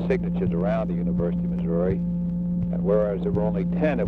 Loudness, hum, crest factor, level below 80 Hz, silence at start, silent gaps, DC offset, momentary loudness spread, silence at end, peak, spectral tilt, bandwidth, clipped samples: -24 LUFS; none; 14 dB; -38 dBFS; 0 s; none; under 0.1%; 4 LU; 0 s; -10 dBFS; -11 dB/octave; 3.9 kHz; under 0.1%